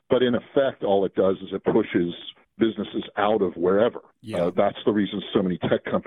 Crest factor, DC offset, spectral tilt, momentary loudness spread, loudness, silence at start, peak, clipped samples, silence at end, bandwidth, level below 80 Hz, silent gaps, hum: 18 dB; under 0.1%; -8 dB/octave; 8 LU; -24 LUFS; 0.1 s; -6 dBFS; under 0.1%; 0.05 s; 10 kHz; -60 dBFS; none; none